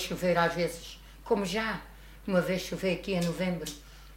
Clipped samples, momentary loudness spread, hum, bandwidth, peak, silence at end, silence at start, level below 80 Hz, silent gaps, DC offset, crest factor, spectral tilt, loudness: under 0.1%; 17 LU; none; 16 kHz; -12 dBFS; 0 s; 0 s; -50 dBFS; none; under 0.1%; 20 dB; -5 dB/octave; -30 LUFS